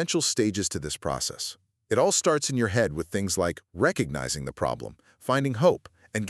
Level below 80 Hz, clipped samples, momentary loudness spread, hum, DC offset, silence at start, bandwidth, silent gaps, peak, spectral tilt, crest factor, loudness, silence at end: -52 dBFS; under 0.1%; 12 LU; none; under 0.1%; 0 s; 13.5 kHz; none; -8 dBFS; -4 dB/octave; 20 dB; -26 LUFS; 0 s